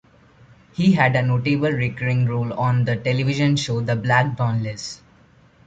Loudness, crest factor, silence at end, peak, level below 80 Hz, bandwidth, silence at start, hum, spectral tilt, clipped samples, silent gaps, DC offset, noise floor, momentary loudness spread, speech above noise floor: -20 LUFS; 18 dB; 0.7 s; -4 dBFS; -52 dBFS; 8 kHz; 0.8 s; none; -6.5 dB/octave; under 0.1%; none; under 0.1%; -53 dBFS; 10 LU; 33 dB